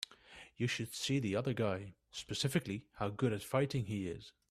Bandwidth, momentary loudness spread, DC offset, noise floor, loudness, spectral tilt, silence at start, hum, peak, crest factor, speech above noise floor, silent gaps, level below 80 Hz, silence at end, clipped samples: 15 kHz; 13 LU; under 0.1%; -58 dBFS; -38 LUFS; -5 dB/octave; 0 s; none; -18 dBFS; 20 dB; 21 dB; none; -66 dBFS; 0.2 s; under 0.1%